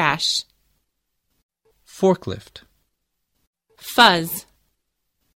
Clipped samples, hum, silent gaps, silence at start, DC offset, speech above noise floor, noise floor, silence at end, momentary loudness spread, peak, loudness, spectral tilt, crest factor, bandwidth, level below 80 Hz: under 0.1%; none; 1.43-1.49 s, 3.47-3.53 s; 0 s; under 0.1%; 56 dB; -75 dBFS; 0.95 s; 19 LU; 0 dBFS; -18 LUFS; -3.5 dB/octave; 24 dB; 16.5 kHz; -58 dBFS